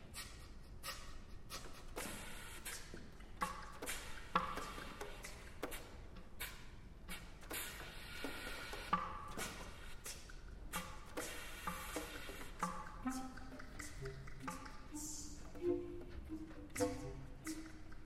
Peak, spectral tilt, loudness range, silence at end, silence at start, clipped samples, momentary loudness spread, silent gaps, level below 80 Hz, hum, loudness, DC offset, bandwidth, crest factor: -20 dBFS; -3.5 dB/octave; 3 LU; 0 s; 0 s; under 0.1%; 12 LU; none; -56 dBFS; none; -47 LUFS; under 0.1%; 16 kHz; 26 dB